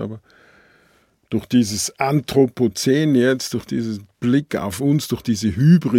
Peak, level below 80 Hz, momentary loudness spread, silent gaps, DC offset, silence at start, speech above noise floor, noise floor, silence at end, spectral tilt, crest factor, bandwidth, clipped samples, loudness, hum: -2 dBFS; -54 dBFS; 10 LU; none; under 0.1%; 0 s; 40 dB; -58 dBFS; 0 s; -6 dB/octave; 18 dB; 16.5 kHz; under 0.1%; -19 LUFS; none